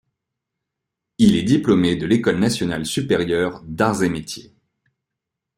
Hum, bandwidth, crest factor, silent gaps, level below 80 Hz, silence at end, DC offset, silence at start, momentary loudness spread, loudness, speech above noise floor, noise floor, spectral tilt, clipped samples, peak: none; 16 kHz; 18 dB; none; -50 dBFS; 1.15 s; under 0.1%; 1.2 s; 8 LU; -19 LUFS; 64 dB; -83 dBFS; -5.5 dB/octave; under 0.1%; -4 dBFS